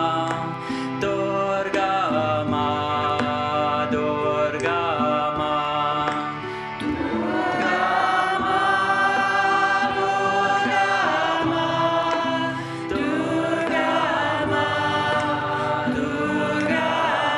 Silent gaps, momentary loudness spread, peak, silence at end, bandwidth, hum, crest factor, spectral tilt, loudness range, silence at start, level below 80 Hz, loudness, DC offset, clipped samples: none; 6 LU; -8 dBFS; 0 s; 11.5 kHz; none; 14 dB; -5 dB/octave; 3 LU; 0 s; -54 dBFS; -22 LUFS; under 0.1%; under 0.1%